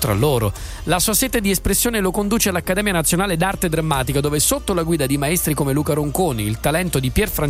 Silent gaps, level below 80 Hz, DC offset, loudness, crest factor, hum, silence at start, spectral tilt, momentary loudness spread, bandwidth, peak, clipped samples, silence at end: none; -32 dBFS; under 0.1%; -18 LUFS; 16 dB; none; 0 s; -4 dB/octave; 4 LU; 16 kHz; -2 dBFS; under 0.1%; 0 s